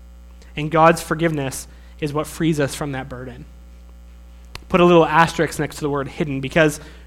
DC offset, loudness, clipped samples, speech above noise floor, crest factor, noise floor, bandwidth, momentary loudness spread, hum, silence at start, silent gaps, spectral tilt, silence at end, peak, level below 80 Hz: under 0.1%; -19 LUFS; under 0.1%; 23 dB; 20 dB; -41 dBFS; 16 kHz; 19 LU; 60 Hz at -40 dBFS; 0 s; none; -5.5 dB/octave; 0 s; 0 dBFS; -40 dBFS